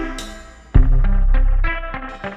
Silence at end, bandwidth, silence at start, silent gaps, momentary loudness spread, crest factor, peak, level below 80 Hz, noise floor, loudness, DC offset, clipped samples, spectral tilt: 0 s; 8.2 kHz; 0 s; none; 14 LU; 14 dB; -2 dBFS; -16 dBFS; -36 dBFS; -21 LUFS; under 0.1%; under 0.1%; -6.5 dB/octave